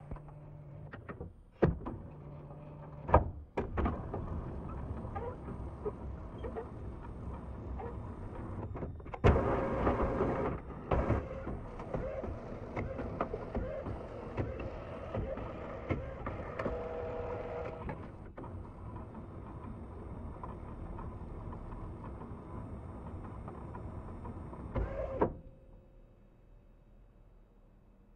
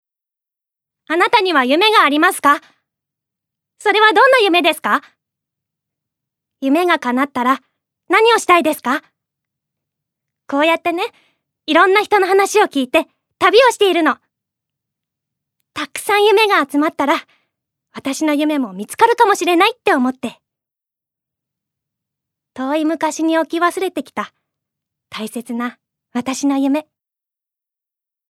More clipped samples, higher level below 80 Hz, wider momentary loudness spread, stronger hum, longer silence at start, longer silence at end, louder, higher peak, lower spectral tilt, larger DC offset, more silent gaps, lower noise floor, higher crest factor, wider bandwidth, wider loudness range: neither; first, -46 dBFS vs -68 dBFS; about the same, 15 LU vs 15 LU; neither; second, 0 s vs 1.1 s; second, 0 s vs 1.5 s; second, -39 LUFS vs -15 LUFS; second, -10 dBFS vs 0 dBFS; first, -9 dB/octave vs -2.5 dB/octave; neither; neither; second, -61 dBFS vs -87 dBFS; first, 30 dB vs 18 dB; second, 9.2 kHz vs 16 kHz; first, 12 LU vs 9 LU